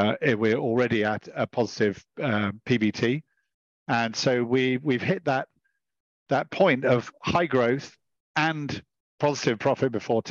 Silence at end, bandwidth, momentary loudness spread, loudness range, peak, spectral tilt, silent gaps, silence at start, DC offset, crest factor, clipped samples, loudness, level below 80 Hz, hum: 0 s; 7.6 kHz; 8 LU; 2 LU; -8 dBFS; -6 dB/octave; 3.54-3.86 s, 6.00-6.26 s, 8.20-8.34 s, 9.00-9.18 s; 0 s; under 0.1%; 18 dB; under 0.1%; -25 LUFS; -62 dBFS; none